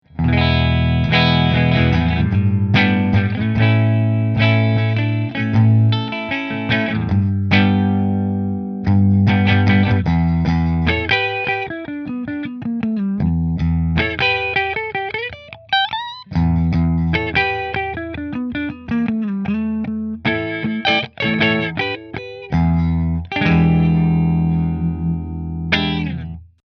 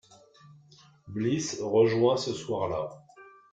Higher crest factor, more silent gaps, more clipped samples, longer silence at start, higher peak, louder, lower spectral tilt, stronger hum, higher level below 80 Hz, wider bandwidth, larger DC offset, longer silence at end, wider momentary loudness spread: about the same, 16 dB vs 20 dB; neither; neither; second, 0.15 s vs 0.5 s; first, 0 dBFS vs -10 dBFS; first, -17 LUFS vs -28 LUFS; first, -8 dB/octave vs -5.5 dB/octave; neither; first, -32 dBFS vs -64 dBFS; second, 6.2 kHz vs 9.2 kHz; neither; about the same, 0.35 s vs 0.25 s; about the same, 10 LU vs 12 LU